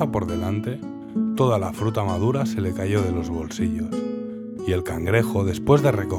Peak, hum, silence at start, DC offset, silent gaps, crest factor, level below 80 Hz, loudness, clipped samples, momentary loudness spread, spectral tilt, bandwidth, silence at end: -4 dBFS; none; 0 s; under 0.1%; none; 18 dB; -48 dBFS; -23 LUFS; under 0.1%; 11 LU; -7 dB/octave; 16.5 kHz; 0 s